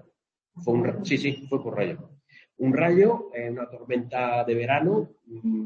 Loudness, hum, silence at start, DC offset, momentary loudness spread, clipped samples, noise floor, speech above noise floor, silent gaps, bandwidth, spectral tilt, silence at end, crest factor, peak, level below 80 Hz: -25 LUFS; none; 0.55 s; under 0.1%; 13 LU; under 0.1%; -70 dBFS; 45 dB; none; 7.4 kHz; -7.5 dB/octave; 0 s; 18 dB; -8 dBFS; -68 dBFS